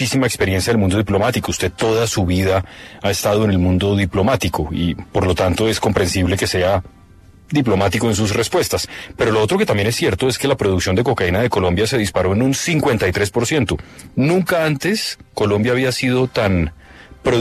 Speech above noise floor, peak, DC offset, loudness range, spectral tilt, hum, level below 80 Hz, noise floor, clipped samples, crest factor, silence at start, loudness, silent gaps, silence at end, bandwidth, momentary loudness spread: 28 dB; -2 dBFS; under 0.1%; 1 LU; -5 dB/octave; none; -40 dBFS; -45 dBFS; under 0.1%; 16 dB; 0 s; -17 LUFS; none; 0 s; 14 kHz; 5 LU